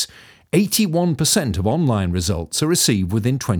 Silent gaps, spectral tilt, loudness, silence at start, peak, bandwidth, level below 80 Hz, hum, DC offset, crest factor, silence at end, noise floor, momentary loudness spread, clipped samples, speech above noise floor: none; -4.5 dB/octave; -19 LUFS; 0 s; -4 dBFS; over 20 kHz; -40 dBFS; none; under 0.1%; 16 dB; 0 s; -40 dBFS; 5 LU; under 0.1%; 21 dB